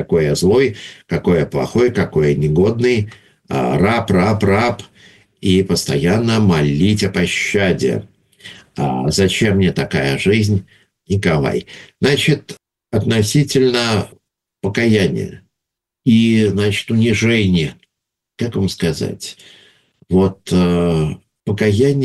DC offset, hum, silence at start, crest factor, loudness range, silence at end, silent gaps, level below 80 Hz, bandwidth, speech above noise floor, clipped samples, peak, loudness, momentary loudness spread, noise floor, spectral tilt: under 0.1%; none; 0 s; 14 dB; 3 LU; 0 s; none; -42 dBFS; 12.5 kHz; 66 dB; under 0.1%; -2 dBFS; -16 LUFS; 10 LU; -81 dBFS; -6 dB/octave